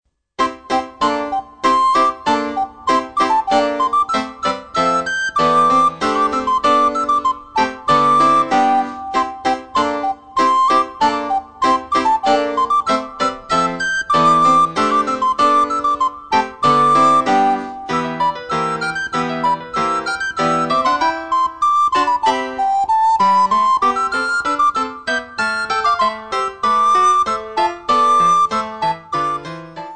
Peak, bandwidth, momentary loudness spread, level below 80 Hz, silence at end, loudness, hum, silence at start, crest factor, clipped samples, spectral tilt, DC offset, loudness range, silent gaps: -2 dBFS; 9.4 kHz; 9 LU; -52 dBFS; 0 s; -16 LUFS; none; 0.4 s; 14 dB; under 0.1%; -4 dB/octave; 0.3%; 3 LU; none